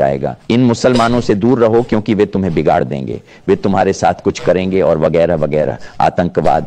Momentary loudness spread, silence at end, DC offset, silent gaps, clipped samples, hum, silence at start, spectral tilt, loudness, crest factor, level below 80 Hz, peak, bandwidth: 5 LU; 0 s; under 0.1%; none; under 0.1%; none; 0 s; -7 dB/octave; -14 LUFS; 12 dB; -38 dBFS; 0 dBFS; 10 kHz